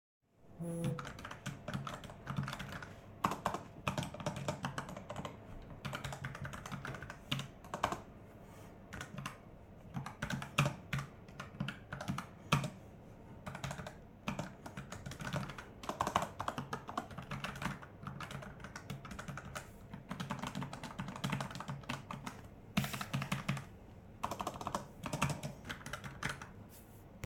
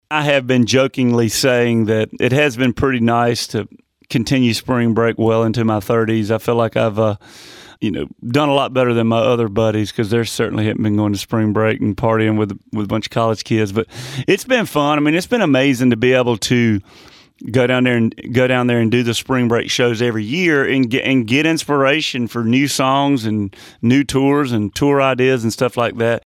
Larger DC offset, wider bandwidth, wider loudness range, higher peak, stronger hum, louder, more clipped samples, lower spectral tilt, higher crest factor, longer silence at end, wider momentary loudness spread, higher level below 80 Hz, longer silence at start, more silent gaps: neither; first, 18.5 kHz vs 16 kHz; about the same, 4 LU vs 2 LU; second, -12 dBFS vs -2 dBFS; neither; second, -43 LUFS vs -16 LUFS; neither; about the same, -5 dB/octave vs -5.5 dB/octave; first, 30 dB vs 14 dB; second, 0 s vs 0.15 s; first, 14 LU vs 6 LU; second, -60 dBFS vs -48 dBFS; first, 0.4 s vs 0.1 s; neither